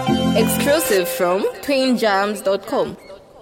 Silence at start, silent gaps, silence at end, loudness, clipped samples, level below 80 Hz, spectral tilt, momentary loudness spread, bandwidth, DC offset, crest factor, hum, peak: 0 s; none; 0 s; -18 LUFS; under 0.1%; -48 dBFS; -4.5 dB/octave; 6 LU; 17 kHz; under 0.1%; 14 dB; none; -4 dBFS